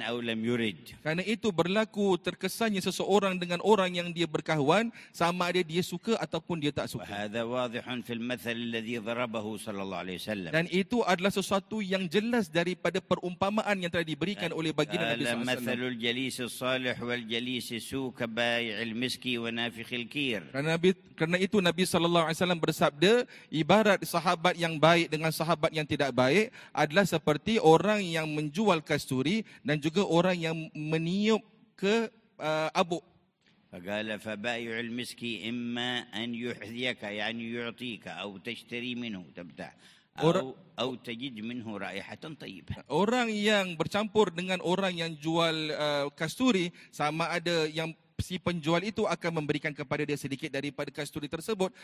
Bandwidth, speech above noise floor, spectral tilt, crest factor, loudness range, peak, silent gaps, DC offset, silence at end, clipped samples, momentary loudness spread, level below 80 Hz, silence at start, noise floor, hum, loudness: 16 kHz; 37 dB; -5 dB/octave; 22 dB; 8 LU; -8 dBFS; none; under 0.1%; 0 s; under 0.1%; 11 LU; -62 dBFS; 0 s; -67 dBFS; none; -30 LUFS